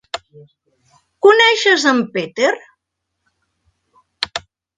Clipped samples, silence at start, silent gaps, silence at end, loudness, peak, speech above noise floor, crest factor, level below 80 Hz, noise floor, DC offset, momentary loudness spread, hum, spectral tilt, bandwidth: under 0.1%; 0.15 s; none; 0.4 s; -14 LUFS; 0 dBFS; 61 dB; 18 dB; -62 dBFS; -76 dBFS; under 0.1%; 19 LU; none; -2.5 dB/octave; 10 kHz